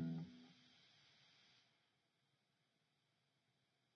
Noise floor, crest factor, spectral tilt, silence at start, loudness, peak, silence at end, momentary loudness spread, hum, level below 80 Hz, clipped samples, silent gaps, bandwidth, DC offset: -85 dBFS; 22 dB; -7 dB/octave; 0 s; -54 LUFS; -36 dBFS; 2.45 s; 19 LU; none; under -90 dBFS; under 0.1%; none; 6.6 kHz; under 0.1%